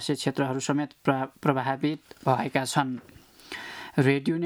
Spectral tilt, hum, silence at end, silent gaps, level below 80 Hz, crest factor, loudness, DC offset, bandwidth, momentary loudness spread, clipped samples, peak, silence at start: -5.5 dB/octave; none; 0 s; none; -68 dBFS; 20 dB; -27 LUFS; under 0.1%; 17.5 kHz; 13 LU; under 0.1%; -6 dBFS; 0 s